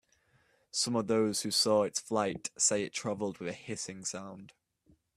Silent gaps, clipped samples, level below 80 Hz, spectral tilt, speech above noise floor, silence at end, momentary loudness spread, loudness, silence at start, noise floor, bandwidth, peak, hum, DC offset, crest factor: none; under 0.1%; -72 dBFS; -3 dB/octave; 37 dB; 0.7 s; 12 LU; -32 LUFS; 0.75 s; -70 dBFS; 15 kHz; -14 dBFS; none; under 0.1%; 20 dB